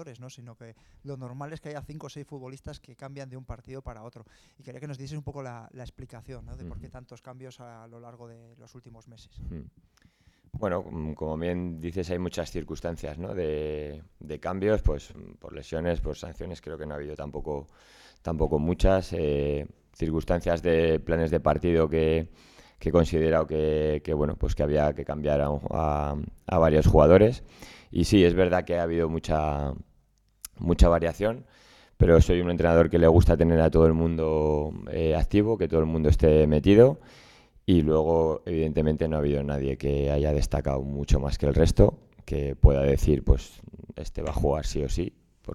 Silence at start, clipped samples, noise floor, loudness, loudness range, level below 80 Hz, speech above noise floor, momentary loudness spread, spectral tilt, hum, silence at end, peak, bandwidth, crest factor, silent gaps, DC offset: 0 s; under 0.1%; -65 dBFS; -25 LUFS; 20 LU; -34 dBFS; 40 dB; 23 LU; -7.5 dB/octave; none; 0 s; -2 dBFS; 13 kHz; 22 dB; none; under 0.1%